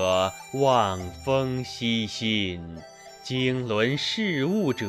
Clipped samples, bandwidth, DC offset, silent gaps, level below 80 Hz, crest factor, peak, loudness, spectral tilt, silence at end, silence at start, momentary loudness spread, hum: under 0.1%; 15.5 kHz; under 0.1%; none; -54 dBFS; 18 dB; -6 dBFS; -25 LUFS; -5 dB/octave; 0 s; 0 s; 13 LU; none